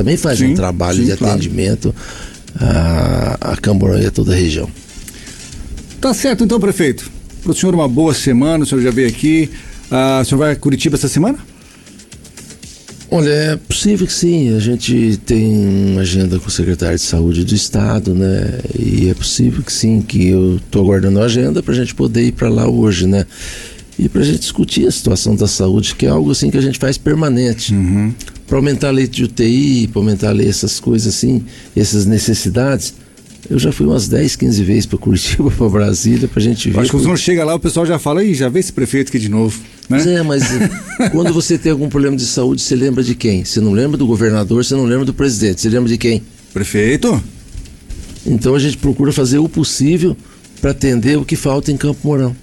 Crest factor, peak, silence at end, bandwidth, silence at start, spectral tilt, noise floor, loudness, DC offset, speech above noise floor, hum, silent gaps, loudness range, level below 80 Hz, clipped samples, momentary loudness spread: 10 dB; -4 dBFS; 0.05 s; 17 kHz; 0 s; -5.5 dB/octave; -39 dBFS; -14 LUFS; under 0.1%; 26 dB; none; none; 3 LU; -30 dBFS; under 0.1%; 8 LU